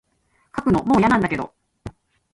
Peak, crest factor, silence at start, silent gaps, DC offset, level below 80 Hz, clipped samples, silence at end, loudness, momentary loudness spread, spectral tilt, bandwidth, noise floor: -6 dBFS; 16 dB; 0.55 s; none; under 0.1%; -46 dBFS; under 0.1%; 0.45 s; -19 LUFS; 24 LU; -7 dB/octave; 11.5 kHz; -65 dBFS